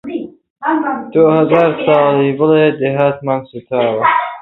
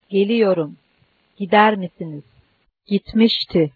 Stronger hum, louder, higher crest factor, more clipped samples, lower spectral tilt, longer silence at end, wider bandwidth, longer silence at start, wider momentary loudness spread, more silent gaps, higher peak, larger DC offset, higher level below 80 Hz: neither; first, -13 LUFS vs -18 LUFS; second, 14 dB vs 20 dB; neither; first, -9.5 dB/octave vs -8 dB/octave; about the same, 0 s vs 0.05 s; second, 4.1 kHz vs 4.9 kHz; about the same, 0.05 s vs 0.1 s; second, 10 LU vs 18 LU; first, 0.50-0.56 s vs none; about the same, 0 dBFS vs 0 dBFS; neither; about the same, -56 dBFS vs -52 dBFS